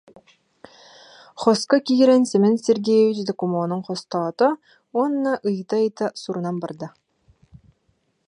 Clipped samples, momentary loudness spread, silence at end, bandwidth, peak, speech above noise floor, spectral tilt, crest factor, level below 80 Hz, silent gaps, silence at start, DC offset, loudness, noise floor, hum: under 0.1%; 12 LU; 1.4 s; 11 kHz; -4 dBFS; 47 dB; -6 dB/octave; 18 dB; -68 dBFS; none; 1.35 s; under 0.1%; -21 LUFS; -67 dBFS; none